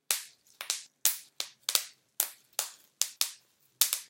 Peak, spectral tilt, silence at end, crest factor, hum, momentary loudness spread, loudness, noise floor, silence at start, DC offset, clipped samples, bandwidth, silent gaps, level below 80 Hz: 0 dBFS; 4 dB/octave; 0.05 s; 34 dB; none; 12 LU; -32 LUFS; -59 dBFS; 0.1 s; under 0.1%; under 0.1%; 17 kHz; none; -82 dBFS